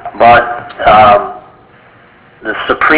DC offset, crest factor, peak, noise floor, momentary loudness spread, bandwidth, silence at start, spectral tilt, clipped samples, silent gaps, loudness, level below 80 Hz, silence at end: under 0.1%; 10 dB; 0 dBFS; -41 dBFS; 16 LU; 4 kHz; 0.05 s; -8 dB/octave; 1%; none; -8 LUFS; -38 dBFS; 0 s